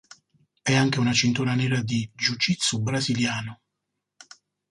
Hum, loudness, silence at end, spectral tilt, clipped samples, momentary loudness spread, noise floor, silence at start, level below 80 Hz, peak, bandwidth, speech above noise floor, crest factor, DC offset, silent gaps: 50 Hz at -55 dBFS; -24 LUFS; 1.15 s; -4 dB/octave; under 0.1%; 7 LU; -82 dBFS; 0.65 s; -60 dBFS; -8 dBFS; 11.5 kHz; 58 dB; 18 dB; under 0.1%; none